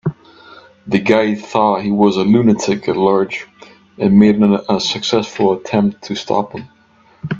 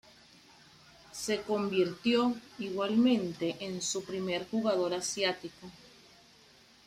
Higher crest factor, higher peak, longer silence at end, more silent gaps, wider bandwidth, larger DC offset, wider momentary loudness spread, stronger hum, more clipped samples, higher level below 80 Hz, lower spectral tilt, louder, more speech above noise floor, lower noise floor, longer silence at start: about the same, 16 dB vs 18 dB; first, 0 dBFS vs -16 dBFS; second, 0 s vs 1 s; neither; second, 7.6 kHz vs 14 kHz; neither; about the same, 11 LU vs 12 LU; neither; neither; first, -52 dBFS vs -70 dBFS; first, -6 dB/octave vs -4 dB/octave; first, -15 LUFS vs -32 LUFS; first, 37 dB vs 29 dB; second, -50 dBFS vs -60 dBFS; second, 0.05 s vs 1.1 s